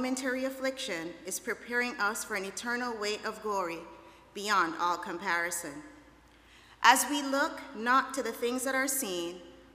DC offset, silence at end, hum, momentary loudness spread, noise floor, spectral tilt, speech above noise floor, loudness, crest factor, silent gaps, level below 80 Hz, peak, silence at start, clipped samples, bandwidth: under 0.1%; 0.1 s; none; 11 LU; -58 dBFS; -1.5 dB/octave; 27 dB; -31 LUFS; 26 dB; none; -68 dBFS; -6 dBFS; 0 s; under 0.1%; 15.5 kHz